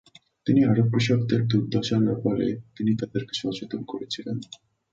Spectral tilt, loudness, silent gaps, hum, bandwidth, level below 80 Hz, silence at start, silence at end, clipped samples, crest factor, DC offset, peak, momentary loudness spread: -7 dB/octave; -25 LUFS; none; none; 7.8 kHz; -58 dBFS; 0.45 s; 0.35 s; under 0.1%; 16 dB; under 0.1%; -8 dBFS; 12 LU